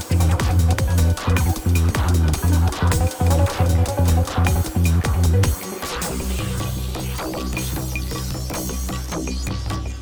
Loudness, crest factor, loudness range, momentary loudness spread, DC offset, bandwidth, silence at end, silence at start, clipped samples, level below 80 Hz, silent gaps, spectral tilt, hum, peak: -21 LUFS; 14 dB; 7 LU; 8 LU; under 0.1%; over 20 kHz; 0 s; 0 s; under 0.1%; -28 dBFS; none; -5.5 dB/octave; none; -6 dBFS